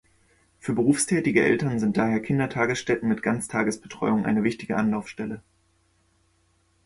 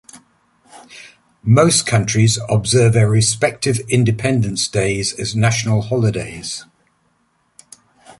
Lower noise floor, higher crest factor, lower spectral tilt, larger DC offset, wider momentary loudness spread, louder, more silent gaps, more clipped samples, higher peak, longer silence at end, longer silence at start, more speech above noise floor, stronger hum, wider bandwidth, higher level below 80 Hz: about the same, -66 dBFS vs -63 dBFS; about the same, 20 dB vs 16 dB; about the same, -5.5 dB/octave vs -4.5 dB/octave; neither; second, 9 LU vs 12 LU; second, -24 LUFS vs -16 LUFS; neither; neither; second, -6 dBFS vs -2 dBFS; first, 1.45 s vs 0.1 s; first, 0.65 s vs 0.15 s; second, 42 dB vs 47 dB; neither; about the same, 11.5 kHz vs 11.5 kHz; second, -58 dBFS vs -44 dBFS